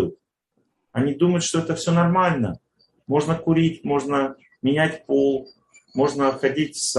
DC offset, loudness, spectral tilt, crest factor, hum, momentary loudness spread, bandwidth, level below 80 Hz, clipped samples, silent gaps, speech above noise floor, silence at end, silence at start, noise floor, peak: under 0.1%; -22 LUFS; -5.5 dB/octave; 18 dB; none; 9 LU; 12 kHz; -56 dBFS; under 0.1%; none; 51 dB; 0 s; 0 s; -72 dBFS; -4 dBFS